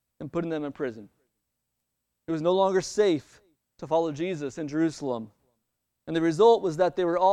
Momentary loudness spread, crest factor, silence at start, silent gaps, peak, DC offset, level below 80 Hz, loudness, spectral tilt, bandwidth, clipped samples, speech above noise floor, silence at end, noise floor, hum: 14 LU; 20 dB; 0.2 s; none; -8 dBFS; under 0.1%; -66 dBFS; -26 LUFS; -6 dB/octave; 11 kHz; under 0.1%; 56 dB; 0 s; -81 dBFS; none